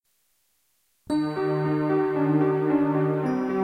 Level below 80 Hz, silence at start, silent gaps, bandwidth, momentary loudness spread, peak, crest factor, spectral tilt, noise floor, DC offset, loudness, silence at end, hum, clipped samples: -64 dBFS; 1.1 s; none; 9.2 kHz; 4 LU; -12 dBFS; 14 dB; -9 dB/octave; -70 dBFS; under 0.1%; -24 LUFS; 0 s; none; under 0.1%